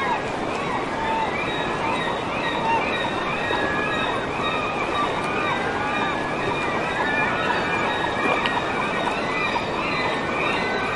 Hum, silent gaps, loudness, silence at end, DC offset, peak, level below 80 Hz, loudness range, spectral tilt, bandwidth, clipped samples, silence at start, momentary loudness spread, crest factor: none; none; -23 LUFS; 0 s; under 0.1%; -4 dBFS; -46 dBFS; 1 LU; -4.5 dB/octave; 11.5 kHz; under 0.1%; 0 s; 3 LU; 18 dB